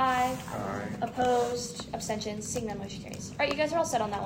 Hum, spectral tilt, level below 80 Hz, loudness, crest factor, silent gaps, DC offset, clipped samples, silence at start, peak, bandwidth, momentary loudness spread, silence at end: none; -4 dB/octave; -56 dBFS; -31 LUFS; 18 dB; none; under 0.1%; under 0.1%; 0 s; -12 dBFS; 16 kHz; 10 LU; 0 s